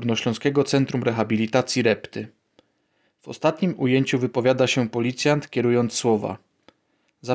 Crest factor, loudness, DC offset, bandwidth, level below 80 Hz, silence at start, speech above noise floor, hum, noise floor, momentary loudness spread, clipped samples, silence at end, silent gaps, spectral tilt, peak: 18 dB; -22 LUFS; under 0.1%; 8 kHz; -62 dBFS; 0 s; 47 dB; none; -69 dBFS; 13 LU; under 0.1%; 0 s; none; -5.5 dB/octave; -4 dBFS